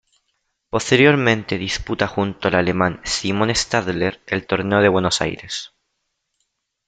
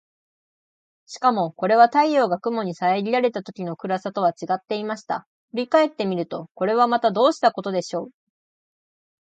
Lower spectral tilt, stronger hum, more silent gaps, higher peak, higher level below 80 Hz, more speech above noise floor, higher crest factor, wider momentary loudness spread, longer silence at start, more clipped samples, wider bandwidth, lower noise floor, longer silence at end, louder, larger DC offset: about the same, -4.5 dB/octave vs -5.5 dB/octave; neither; second, none vs 5.26-5.48 s; about the same, 0 dBFS vs -2 dBFS; first, -46 dBFS vs -76 dBFS; second, 55 dB vs over 69 dB; about the same, 20 dB vs 20 dB; about the same, 11 LU vs 13 LU; second, 0.75 s vs 1.1 s; neither; about the same, 9.4 kHz vs 8.8 kHz; second, -74 dBFS vs under -90 dBFS; about the same, 1.2 s vs 1.25 s; first, -19 LUFS vs -22 LUFS; neither